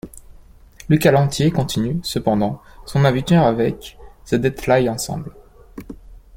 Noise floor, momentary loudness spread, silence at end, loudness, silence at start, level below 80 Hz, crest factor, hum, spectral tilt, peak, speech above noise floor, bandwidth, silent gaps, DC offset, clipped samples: -44 dBFS; 22 LU; 0 s; -18 LUFS; 0.05 s; -42 dBFS; 18 dB; none; -6 dB/octave; -2 dBFS; 27 dB; 16.5 kHz; none; under 0.1%; under 0.1%